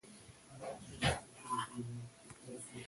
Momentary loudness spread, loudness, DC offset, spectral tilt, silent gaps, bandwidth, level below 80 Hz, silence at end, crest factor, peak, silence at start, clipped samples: 19 LU; -42 LUFS; under 0.1%; -4 dB/octave; none; 11.5 kHz; -58 dBFS; 0 s; 24 dB; -20 dBFS; 0.05 s; under 0.1%